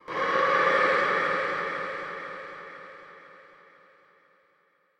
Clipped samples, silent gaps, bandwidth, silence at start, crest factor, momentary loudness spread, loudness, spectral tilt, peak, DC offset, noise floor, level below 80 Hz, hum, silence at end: under 0.1%; none; 10.5 kHz; 0.05 s; 18 dB; 23 LU; -25 LUFS; -4 dB/octave; -12 dBFS; under 0.1%; -67 dBFS; -68 dBFS; none; 1.6 s